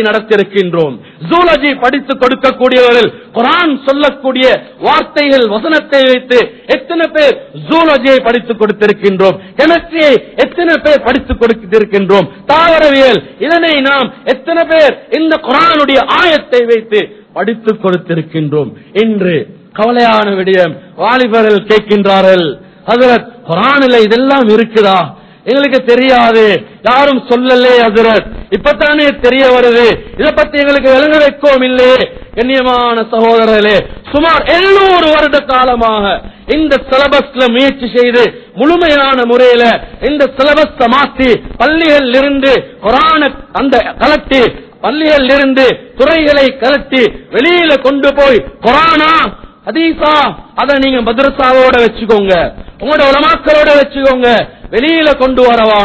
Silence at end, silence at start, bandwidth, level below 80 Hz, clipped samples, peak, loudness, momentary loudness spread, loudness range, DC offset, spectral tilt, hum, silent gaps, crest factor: 0 s; 0 s; 8 kHz; -34 dBFS; 2%; 0 dBFS; -8 LUFS; 7 LU; 2 LU; 0.1%; -6 dB/octave; none; none; 8 dB